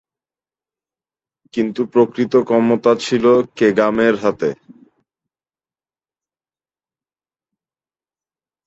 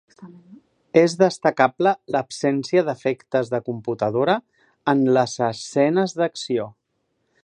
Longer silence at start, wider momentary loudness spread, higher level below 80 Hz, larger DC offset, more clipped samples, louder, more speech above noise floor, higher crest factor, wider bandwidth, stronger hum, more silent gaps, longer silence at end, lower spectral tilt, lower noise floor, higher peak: first, 1.55 s vs 0.2 s; about the same, 9 LU vs 8 LU; first, -60 dBFS vs -68 dBFS; neither; neither; first, -16 LUFS vs -21 LUFS; first, over 75 dB vs 52 dB; about the same, 18 dB vs 20 dB; second, 8 kHz vs 10.5 kHz; neither; neither; first, 4.1 s vs 0.75 s; about the same, -6 dB/octave vs -5.5 dB/octave; first, under -90 dBFS vs -72 dBFS; about the same, -2 dBFS vs 0 dBFS